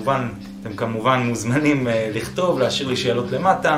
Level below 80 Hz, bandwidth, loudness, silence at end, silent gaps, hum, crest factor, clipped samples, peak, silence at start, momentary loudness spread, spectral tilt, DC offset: -50 dBFS; 16 kHz; -21 LUFS; 0 s; none; none; 18 dB; under 0.1%; -4 dBFS; 0 s; 8 LU; -5.5 dB/octave; under 0.1%